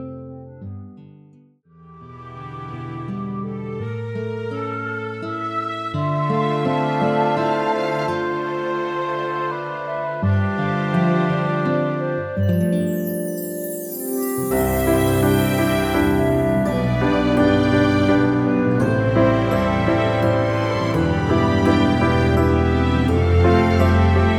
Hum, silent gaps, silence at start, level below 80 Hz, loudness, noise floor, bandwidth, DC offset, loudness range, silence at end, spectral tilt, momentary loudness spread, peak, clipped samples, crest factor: none; none; 0 s; -36 dBFS; -20 LUFS; -51 dBFS; over 20 kHz; under 0.1%; 11 LU; 0 s; -7 dB/octave; 12 LU; -4 dBFS; under 0.1%; 16 dB